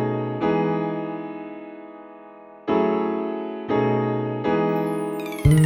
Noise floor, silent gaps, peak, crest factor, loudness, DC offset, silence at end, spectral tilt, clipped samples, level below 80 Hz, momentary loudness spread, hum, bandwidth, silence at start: -44 dBFS; none; -6 dBFS; 18 dB; -24 LUFS; under 0.1%; 0 s; -8 dB/octave; under 0.1%; -40 dBFS; 19 LU; none; 16 kHz; 0 s